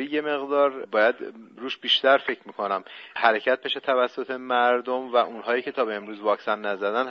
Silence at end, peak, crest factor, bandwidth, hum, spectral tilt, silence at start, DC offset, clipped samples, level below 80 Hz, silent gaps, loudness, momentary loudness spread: 0 s; -4 dBFS; 22 dB; 6.8 kHz; none; 0.5 dB/octave; 0 s; under 0.1%; under 0.1%; -78 dBFS; none; -24 LUFS; 10 LU